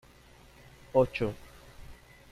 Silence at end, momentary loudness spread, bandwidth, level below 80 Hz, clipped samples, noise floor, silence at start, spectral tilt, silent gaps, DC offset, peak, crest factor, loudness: 0.35 s; 26 LU; 14.5 kHz; -54 dBFS; under 0.1%; -56 dBFS; 0.95 s; -7 dB/octave; none; under 0.1%; -12 dBFS; 22 dB; -30 LUFS